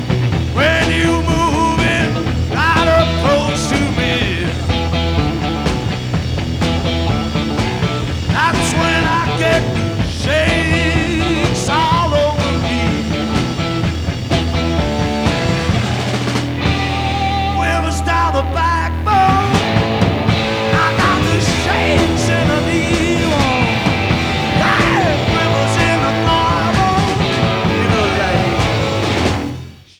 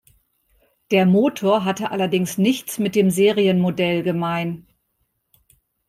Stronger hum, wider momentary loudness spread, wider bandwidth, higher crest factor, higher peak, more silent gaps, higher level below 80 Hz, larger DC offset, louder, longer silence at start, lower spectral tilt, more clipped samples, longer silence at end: neither; about the same, 5 LU vs 7 LU; first, 17.5 kHz vs 15.5 kHz; about the same, 14 dB vs 16 dB; first, 0 dBFS vs -4 dBFS; neither; first, -26 dBFS vs -62 dBFS; neither; first, -15 LUFS vs -19 LUFS; second, 0 s vs 0.9 s; about the same, -5.5 dB/octave vs -6 dB/octave; neither; second, 0.2 s vs 1.3 s